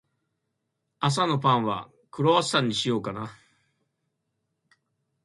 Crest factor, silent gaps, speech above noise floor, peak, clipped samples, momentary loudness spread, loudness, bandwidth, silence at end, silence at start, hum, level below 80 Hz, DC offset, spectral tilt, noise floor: 20 dB; none; 55 dB; -8 dBFS; under 0.1%; 14 LU; -25 LUFS; 11.5 kHz; 1.9 s; 1 s; none; -66 dBFS; under 0.1%; -5 dB/octave; -80 dBFS